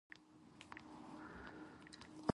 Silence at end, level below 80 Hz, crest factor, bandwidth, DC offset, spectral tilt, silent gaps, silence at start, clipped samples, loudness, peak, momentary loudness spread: 0 s; -74 dBFS; 30 dB; 11.5 kHz; under 0.1%; -6 dB/octave; none; 0.1 s; under 0.1%; -54 LUFS; -22 dBFS; 8 LU